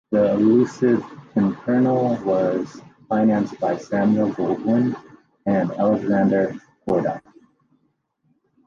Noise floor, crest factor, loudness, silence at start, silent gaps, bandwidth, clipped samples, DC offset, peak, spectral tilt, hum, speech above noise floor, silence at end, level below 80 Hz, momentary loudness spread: -68 dBFS; 14 dB; -21 LUFS; 0.1 s; none; 7.4 kHz; under 0.1%; under 0.1%; -6 dBFS; -8.5 dB/octave; none; 49 dB; 1.45 s; -60 dBFS; 9 LU